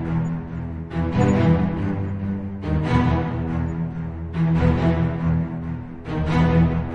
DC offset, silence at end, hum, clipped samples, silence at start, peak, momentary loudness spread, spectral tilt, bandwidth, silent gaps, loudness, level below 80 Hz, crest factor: under 0.1%; 0 s; none; under 0.1%; 0 s; -4 dBFS; 11 LU; -9 dB/octave; 7.4 kHz; none; -22 LUFS; -36 dBFS; 16 dB